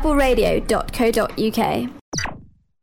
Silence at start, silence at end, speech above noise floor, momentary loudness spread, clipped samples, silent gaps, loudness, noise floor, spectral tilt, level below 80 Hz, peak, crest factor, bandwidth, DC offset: 0 s; 0.35 s; 24 dB; 9 LU; under 0.1%; 2.01-2.12 s; -20 LUFS; -43 dBFS; -4.5 dB/octave; -30 dBFS; -6 dBFS; 14 dB; 17.5 kHz; under 0.1%